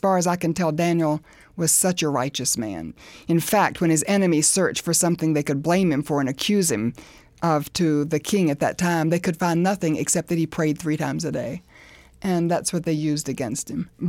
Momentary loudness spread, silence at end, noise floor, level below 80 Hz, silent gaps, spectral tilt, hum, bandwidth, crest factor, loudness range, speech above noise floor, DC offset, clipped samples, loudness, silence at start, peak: 9 LU; 0 s; -49 dBFS; -54 dBFS; none; -4.5 dB/octave; none; 17 kHz; 16 dB; 4 LU; 27 dB; under 0.1%; under 0.1%; -22 LUFS; 0.05 s; -6 dBFS